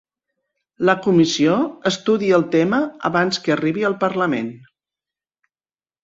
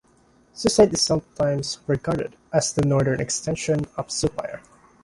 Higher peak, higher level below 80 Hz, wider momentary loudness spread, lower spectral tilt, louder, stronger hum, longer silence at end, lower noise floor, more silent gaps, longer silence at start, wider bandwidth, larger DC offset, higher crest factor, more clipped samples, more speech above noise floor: about the same, -2 dBFS vs -4 dBFS; second, -62 dBFS vs -48 dBFS; second, 6 LU vs 10 LU; about the same, -5.5 dB/octave vs -4.5 dB/octave; first, -18 LUFS vs -23 LUFS; neither; first, 1.45 s vs 0.45 s; first, under -90 dBFS vs -58 dBFS; neither; first, 0.8 s vs 0.55 s; second, 7.8 kHz vs 11.5 kHz; neither; about the same, 18 dB vs 20 dB; neither; first, over 72 dB vs 36 dB